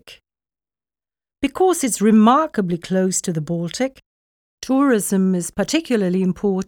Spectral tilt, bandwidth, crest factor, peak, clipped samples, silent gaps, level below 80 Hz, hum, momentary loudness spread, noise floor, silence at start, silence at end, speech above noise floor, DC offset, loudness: -5.5 dB/octave; 18 kHz; 18 dB; -2 dBFS; under 0.1%; 4.06-4.58 s; -54 dBFS; none; 11 LU; under -90 dBFS; 0.05 s; 0.05 s; over 72 dB; under 0.1%; -19 LUFS